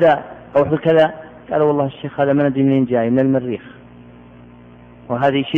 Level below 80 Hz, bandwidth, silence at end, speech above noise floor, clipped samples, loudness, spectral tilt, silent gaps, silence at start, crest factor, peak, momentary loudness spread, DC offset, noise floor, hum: -52 dBFS; 4.5 kHz; 0 s; 26 dB; under 0.1%; -17 LUFS; -9 dB/octave; none; 0 s; 14 dB; -4 dBFS; 9 LU; under 0.1%; -42 dBFS; 60 Hz at -40 dBFS